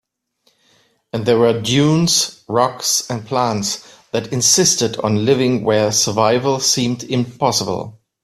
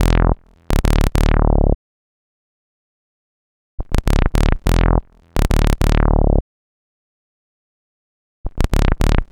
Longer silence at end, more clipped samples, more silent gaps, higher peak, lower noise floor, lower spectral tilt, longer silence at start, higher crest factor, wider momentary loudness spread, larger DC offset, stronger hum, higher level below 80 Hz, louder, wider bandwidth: first, 0.3 s vs 0.05 s; neither; second, none vs 1.75-3.78 s, 6.41-8.44 s; about the same, 0 dBFS vs 0 dBFS; second, -63 dBFS vs under -90 dBFS; second, -3.5 dB/octave vs -6.5 dB/octave; first, 1.15 s vs 0 s; about the same, 18 dB vs 16 dB; about the same, 10 LU vs 9 LU; neither; neither; second, -54 dBFS vs -18 dBFS; first, -16 LUFS vs -19 LUFS; about the same, 16 kHz vs 17 kHz